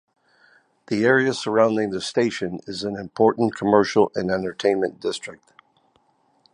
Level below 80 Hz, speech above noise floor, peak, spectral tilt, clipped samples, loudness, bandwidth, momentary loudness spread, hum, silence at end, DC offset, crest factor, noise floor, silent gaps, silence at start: -60 dBFS; 42 dB; -2 dBFS; -5 dB/octave; under 0.1%; -22 LUFS; 10.5 kHz; 11 LU; none; 1.2 s; under 0.1%; 20 dB; -63 dBFS; none; 0.9 s